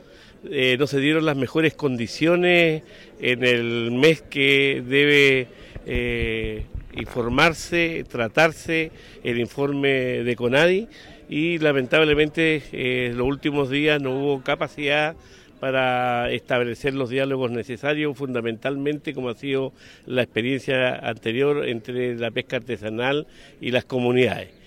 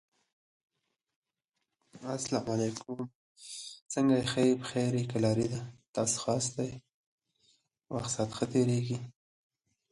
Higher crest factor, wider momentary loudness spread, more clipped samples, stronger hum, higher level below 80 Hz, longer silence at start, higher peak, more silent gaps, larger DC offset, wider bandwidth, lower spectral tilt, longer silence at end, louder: about the same, 18 dB vs 18 dB; second, 10 LU vs 15 LU; neither; neither; first, -46 dBFS vs -66 dBFS; second, 0.45 s vs 1.95 s; first, -4 dBFS vs -14 dBFS; second, none vs 3.15-3.36 s, 3.82-3.86 s, 5.88-5.94 s, 6.94-7.18 s; neither; first, 16 kHz vs 11.5 kHz; about the same, -5.5 dB/octave vs -5 dB/octave; second, 0.2 s vs 0.8 s; first, -22 LUFS vs -32 LUFS